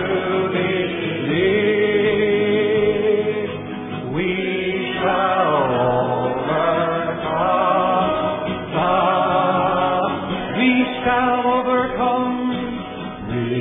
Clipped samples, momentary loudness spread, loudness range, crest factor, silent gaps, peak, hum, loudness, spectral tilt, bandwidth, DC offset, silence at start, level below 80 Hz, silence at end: under 0.1%; 7 LU; 2 LU; 14 dB; none; -6 dBFS; none; -19 LUFS; -10 dB/octave; 3.9 kHz; under 0.1%; 0 s; -48 dBFS; 0 s